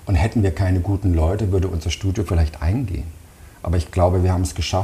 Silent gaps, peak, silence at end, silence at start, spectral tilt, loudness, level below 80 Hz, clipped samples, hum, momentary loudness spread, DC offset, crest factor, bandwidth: none; -6 dBFS; 0 s; 0 s; -6.5 dB/octave; -21 LUFS; -28 dBFS; under 0.1%; none; 6 LU; under 0.1%; 14 dB; 13 kHz